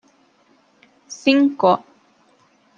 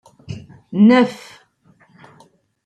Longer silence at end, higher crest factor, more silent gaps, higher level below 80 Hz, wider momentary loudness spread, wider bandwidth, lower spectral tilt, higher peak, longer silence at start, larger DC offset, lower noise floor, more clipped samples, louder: second, 1 s vs 1.5 s; about the same, 20 dB vs 18 dB; neither; second, -72 dBFS vs -60 dBFS; second, 9 LU vs 23 LU; second, 7.4 kHz vs 8.8 kHz; second, -5 dB/octave vs -7 dB/octave; about the same, -2 dBFS vs -2 dBFS; first, 1.1 s vs 0.3 s; neither; about the same, -58 dBFS vs -55 dBFS; neither; second, -18 LUFS vs -15 LUFS